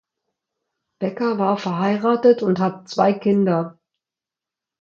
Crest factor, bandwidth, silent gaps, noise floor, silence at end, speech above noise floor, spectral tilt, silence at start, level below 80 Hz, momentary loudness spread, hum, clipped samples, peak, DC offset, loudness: 18 dB; 7.2 kHz; none; -88 dBFS; 1.1 s; 70 dB; -7.5 dB/octave; 1 s; -68 dBFS; 8 LU; none; under 0.1%; -4 dBFS; under 0.1%; -20 LUFS